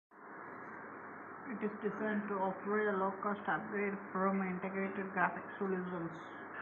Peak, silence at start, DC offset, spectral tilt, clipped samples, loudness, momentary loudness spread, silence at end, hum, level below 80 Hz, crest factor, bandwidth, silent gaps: -16 dBFS; 0.1 s; under 0.1%; -6 dB/octave; under 0.1%; -38 LUFS; 13 LU; 0 s; none; -80 dBFS; 22 dB; 6.6 kHz; none